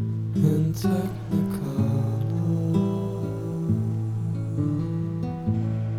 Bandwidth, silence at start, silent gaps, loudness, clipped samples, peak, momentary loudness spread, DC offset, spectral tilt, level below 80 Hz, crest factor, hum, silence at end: 15 kHz; 0 s; none; -26 LUFS; under 0.1%; -8 dBFS; 5 LU; under 0.1%; -9 dB/octave; -50 dBFS; 16 dB; none; 0 s